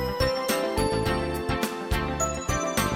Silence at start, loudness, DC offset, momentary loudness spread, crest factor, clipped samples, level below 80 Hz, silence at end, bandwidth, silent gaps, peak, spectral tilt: 0 s; -27 LUFS; under 0.1%; 3 LU; 16 dB; under 0.1%; -36 dBFS; 0 s; 17 kHz; none; -12 dBFS; -4 dB/octave